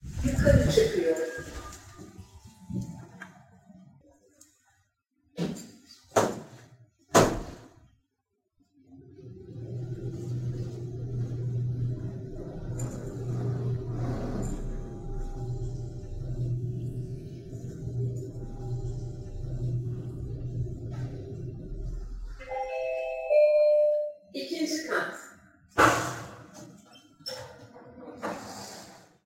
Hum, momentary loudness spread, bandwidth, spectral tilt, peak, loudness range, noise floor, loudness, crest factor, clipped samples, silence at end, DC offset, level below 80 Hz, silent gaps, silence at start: none; 23 LU; 16.5 kHz; -5.5 dB/octave; -4 dBFS; 13 LU; -80 dBFS; -30 LUFS; 26 dB; under 0.1%; 0.2 s; under 0.1%; -42 dBFS; none; 0 s